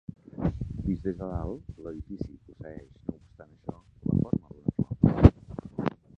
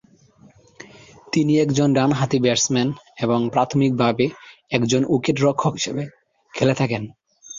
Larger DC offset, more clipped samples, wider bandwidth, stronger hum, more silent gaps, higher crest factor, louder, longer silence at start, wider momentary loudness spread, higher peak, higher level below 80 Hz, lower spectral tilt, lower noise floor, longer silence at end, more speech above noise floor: neither; neither; second, 6.2 kHz vs 7.6 kHz; neither; neither; first, 28 dB vs 18 dB; second, -28 LUFS vs -20 LUFS; second, 0.1 s vs 1.35 s; first, 22 LU vs 8 LU; about the same, 0 dBFS vs -2 dBFS; first, -38 dBFS vs -56 dBFS; first, -10.5 dB/octave vs -5 dB/octave; about the same, -54 dBFS vs -52 dBFS; first, 0.3 s vs 0 s; second, 21 dB vs 33 dB